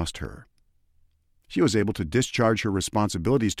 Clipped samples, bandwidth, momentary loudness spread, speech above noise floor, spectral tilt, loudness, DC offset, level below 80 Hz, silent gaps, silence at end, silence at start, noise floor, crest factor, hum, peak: under 0.1%; 15.5 kHz; 10 LU; 39 dB; -5 dB/octave; -24 LUFS; under 0.1%; -46 dBFS; none; 0 s; 0 s; -63 dBFS; 16 dB; none; -10 dBFS